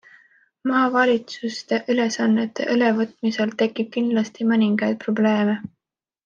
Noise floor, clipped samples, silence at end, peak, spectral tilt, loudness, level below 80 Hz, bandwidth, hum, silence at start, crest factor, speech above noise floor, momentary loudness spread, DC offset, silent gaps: -55 dBFS; under 0.1%; 0.6 s; -6 dBFS; -5.5 dB/octave; -21 LUFS; -72 dBFS; 7.4 kHz; none; 0.65 s; 16 dB; 35 dB; 6 LU; under 0.1%; none